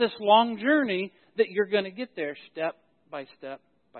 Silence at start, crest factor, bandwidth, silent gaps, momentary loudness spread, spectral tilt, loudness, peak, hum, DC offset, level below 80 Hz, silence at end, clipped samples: 0 s; 20 dB; 4.4 kHz; none; 20 LU; -9 dB/octave; -26 LUFS; -6 dBFS; none; under 0.1%; -80 dBFS; 0 s; under 0.1%